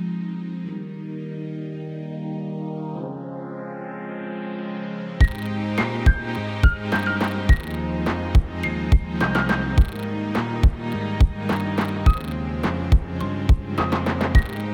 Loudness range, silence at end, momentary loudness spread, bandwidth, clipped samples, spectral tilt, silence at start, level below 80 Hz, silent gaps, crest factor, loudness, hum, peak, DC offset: 9 LU; 0 s; 12 LU; 16 kHz; under 0.1%; -7.5 dB/octave; 0 s; -24 dBFS; none; 16 dB; -24 LUFS; none; -4 dBFS; under 0.1%